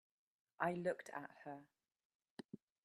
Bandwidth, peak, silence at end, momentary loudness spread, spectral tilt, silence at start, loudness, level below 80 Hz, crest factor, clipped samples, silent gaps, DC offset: 13 kHz; -22 dBFS; 0.3 s; 19 LU; -6.5 dB/octave; 0.6 s; -45 LUFS; -86 dBFS; 26 dB; under 0.1%; 2.05-2.20 s, 2.30-2.37 s, 2.45-2.49 s; under 0.1%